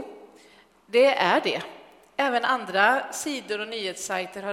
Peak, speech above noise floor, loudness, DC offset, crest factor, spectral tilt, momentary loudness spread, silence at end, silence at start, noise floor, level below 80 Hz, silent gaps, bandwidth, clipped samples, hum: -6 dBFS; 31 dB; -24 LUFS; under 0.1%; 20 dB; -2.5 dB/octave; 11 LU; 0 s; 0 s; -55 dBFS; -74 dBFS; none; 16 kHz; under 0.1%; none